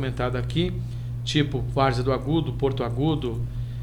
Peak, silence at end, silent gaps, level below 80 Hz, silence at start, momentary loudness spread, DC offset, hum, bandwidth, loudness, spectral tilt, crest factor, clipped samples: -8 dBFS; 0 s; none; -36 dBFS; 0 s; 8 LU; under 0.1%; none; 11 kHz; -25 LUFS; -7 dB/octave; 16 dB; under 0.1%